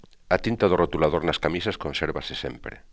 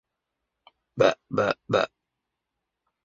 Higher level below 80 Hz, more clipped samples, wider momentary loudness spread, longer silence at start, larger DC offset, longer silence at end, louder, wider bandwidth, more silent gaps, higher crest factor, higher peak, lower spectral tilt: first, -42 dBFS vs -66 dBFS; neither; first, 11 LU vs 8 LU; second, 0.3 s vs 0.95 s; first, 0.1% vs under 0.1%; second, 0.15 s vs 1.2 s; about the same, -25 LUFS vs -25 LUFS; about the same, 8 kHz vs 7.6 kHz; neither; about the same, 22 dB vs 24 dB; about the same, -4 dBFS vs -6 dBFS; about the same, -6 dB/octave vs -5.5 dB/octave